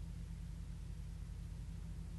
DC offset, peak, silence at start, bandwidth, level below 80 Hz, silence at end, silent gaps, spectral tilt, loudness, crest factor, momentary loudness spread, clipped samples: under 0.1%; -36 dBFS; 0 s; 12 kHz; -48 dBFS; 0 s; none; -6.5 dB/octave; -50 LUFS; 10 dB; 0 LU; under 0.1%